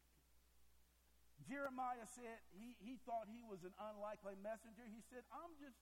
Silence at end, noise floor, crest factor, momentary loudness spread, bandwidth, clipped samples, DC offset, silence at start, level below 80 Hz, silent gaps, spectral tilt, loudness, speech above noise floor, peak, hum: 0 s; -75 dBFS; 20 dB; 11 LU; 16.5 kHz; under 0.1%; under 0.1%; 0 s; -78 dBFS; none; -5 dB/octave; -53 LUFS; 22 dB; -34 dBFS; none